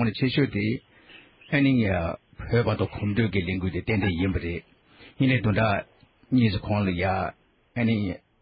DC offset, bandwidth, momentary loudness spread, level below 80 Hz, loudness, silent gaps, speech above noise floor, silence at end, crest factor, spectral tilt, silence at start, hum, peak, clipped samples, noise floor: under 0.1%; 5.2 kHz; 11 LU; -42 dBFS; -25 LUFS; none; 28 dB; 0.25 s; 16 dB; -11.5 dB/octave; 0 s; none; -10 dBFS; under 0.1%; -52 dBFS